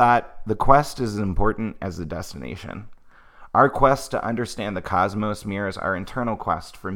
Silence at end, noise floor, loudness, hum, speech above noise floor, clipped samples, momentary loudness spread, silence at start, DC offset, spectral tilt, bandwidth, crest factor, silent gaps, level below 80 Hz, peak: 0 s; -46 dBFS; -23 LUFS; none; 24 dB; under 0.1%; 15 LU; 0 s; under 0.1%; -6 dB/octave; 16.5 kHz; 22 dB; none; -36 dBFS; 0 dBFS